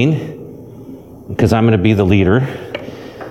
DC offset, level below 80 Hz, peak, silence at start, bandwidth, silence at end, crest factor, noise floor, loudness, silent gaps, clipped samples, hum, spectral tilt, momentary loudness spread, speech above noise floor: under 0.1%; -38 dBFS; 0 dBFS; 0 s; 13.5 kHz; 0 s; 14 dB; -34 dBFS; -14 LUFS; none; under 0.1%; none; -8 dB/octave; 22 LU; 22 dB